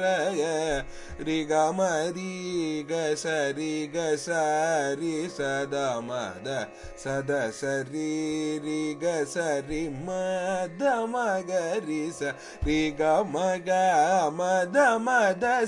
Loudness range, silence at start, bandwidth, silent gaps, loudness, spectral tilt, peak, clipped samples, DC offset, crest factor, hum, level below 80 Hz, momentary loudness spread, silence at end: 5 LU; 0 s; 11.5 kHz; none; -27 LUFS; -4.5 dB/octave; -12 dBFS; under 0.1%; under 0.1%; 16 dB; none; -50 dBFS; 10 LU; 0 s